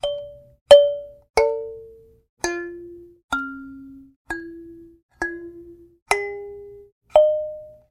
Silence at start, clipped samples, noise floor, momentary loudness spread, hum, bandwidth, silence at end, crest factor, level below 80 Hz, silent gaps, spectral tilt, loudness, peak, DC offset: 0.05 s; under 0.1%; -46 dBFS; 27 LU; none; 14.5 kHz; 0.2 s; 22 dB; -52 dBFS; 0.61-0.66 s, 1.30-1.34 s, 2.29-2.37 s, 3.24-3.29 s, 4.16-4.25 s, 5.03-5.09 s, 6.02-6.06 s, 6.92-7.01 s; -3 dB/octave; -20 LUFS; 0 dBFS; under 0.1%